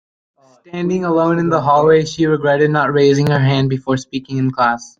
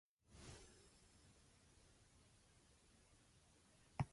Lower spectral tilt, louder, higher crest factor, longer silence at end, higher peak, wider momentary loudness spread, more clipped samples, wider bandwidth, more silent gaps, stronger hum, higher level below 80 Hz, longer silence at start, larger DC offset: about the same, -6.5 dB/octave vs -5.5 dB/octave; first, -15 LUFS vs -58 LUFS; second, 14 dB vs 28 dB; first, 0.15 s vs 0 s; first, -2 dBFS vs -30 dBFS; second, 8 LU vs 15 LU; neither; second, 7.8 kHz vs 11.5 kHz; neither; neither; first, -52 dBFS vs -70 dBFS; first, 0.75 s vs 0.25 s; neither